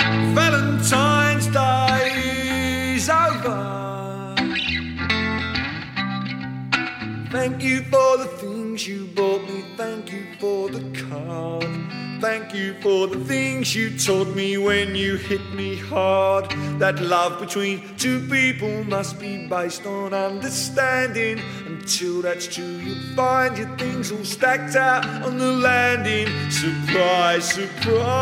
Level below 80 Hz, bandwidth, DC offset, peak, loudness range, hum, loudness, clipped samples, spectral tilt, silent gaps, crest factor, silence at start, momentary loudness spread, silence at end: -50 dBFS; 16.5 kHz; under 0.1%; -4 dBFS; 5 LU; none; -22 LUFS; under 0.1%; -4 dB/octave; none; 18 dB; 0 s; 11 LU; 0 s